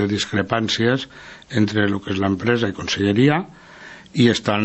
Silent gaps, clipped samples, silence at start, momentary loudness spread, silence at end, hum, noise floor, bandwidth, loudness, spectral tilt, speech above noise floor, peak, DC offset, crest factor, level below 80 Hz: none; under 0.1%; 0 s; 17 LU; 0 s; none; -41 dBFS; 8.4 kHz; -20 LUFS; -5.5 dB/octave; 22 dB; -2 dBFS; under 0.1%; 18 dB; -54 dBFS